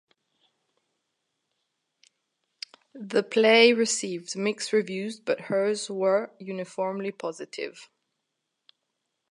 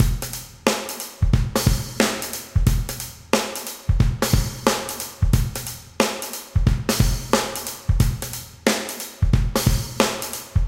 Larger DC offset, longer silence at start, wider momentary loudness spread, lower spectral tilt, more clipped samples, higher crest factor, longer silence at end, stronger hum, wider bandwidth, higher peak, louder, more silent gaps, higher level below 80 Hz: neither; first, 2.95 s vs 0 s; first, 18 LU vs 8 LU; second, -3 dB/octave vs -4.5 dB/octave; neither; about the same, 24 dB vs 20 dB; first, 1.45 s vs 0 s; neither; second, 11.5 kHz vs 17 kHz; about the same, -4 dBFS vs -2 dBFS; about the same, -25 LUFS vs -23 LUFS; neither; second, -86 dBFS vs -26 dBFS